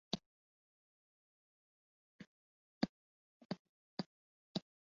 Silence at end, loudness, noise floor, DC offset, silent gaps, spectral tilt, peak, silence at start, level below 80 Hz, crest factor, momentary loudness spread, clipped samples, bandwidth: 0.3 s; -47 LUFS; under -90 dBFS; under 0.1%; 0.26-2.19 s, 2.27-2.81 s, 2.89-3.49 s, 3.59-3.97 s, 4.06-4.55 s; -4.5 dB/octave; -20 dBFS; 0.1 s; -80 dBFS; 32 dB; 19 LU; under 0.1%; 7.2 kHz